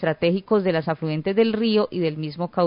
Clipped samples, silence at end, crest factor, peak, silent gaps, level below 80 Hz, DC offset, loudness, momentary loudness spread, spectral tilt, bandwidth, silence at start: under 0.1%; 0 s; 14 dB; -8 dBFS; none; -58 dBFS; under 0.1%; -22 LUFS; 6 LU; -11.5 dB/octave; 5.4 kHz; 0 s